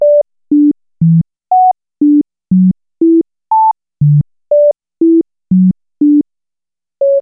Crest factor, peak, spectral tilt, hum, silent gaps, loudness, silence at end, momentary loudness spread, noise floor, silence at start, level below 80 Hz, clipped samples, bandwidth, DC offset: 8 dB; -4 dBFS; -18 dB/octave; none; none; -12 LUFS; 0 s; 3 LU; -89 dBFS; 0 s; -48 dBFS; under 0.1%; 1.2 kHz; under 0.1%